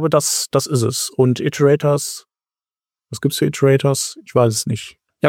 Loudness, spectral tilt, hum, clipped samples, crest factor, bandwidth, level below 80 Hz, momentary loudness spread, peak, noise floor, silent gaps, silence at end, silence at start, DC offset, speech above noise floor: -17 LUFS; -5 dB/octave; none; under 0.1%; 16 dB; 17 kHz; -58 dBFS; 11 LU; -2 dBFS; under -90 dBFS; none; 0 s; 0 s; under 0.1%; over 73 dB